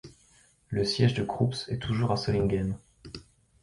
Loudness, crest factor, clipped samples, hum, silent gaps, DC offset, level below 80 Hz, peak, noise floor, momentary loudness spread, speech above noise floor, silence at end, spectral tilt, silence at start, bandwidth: -28 LUFS; 18 dB; under 0.1%; none; none; under 0.1%; -48 dBFS; -10 dBFS; -62 dBFS; 20 LU; 35 dB; 0.4 s; -6.5 dB/octave; 0.05 s; 11.5 kHz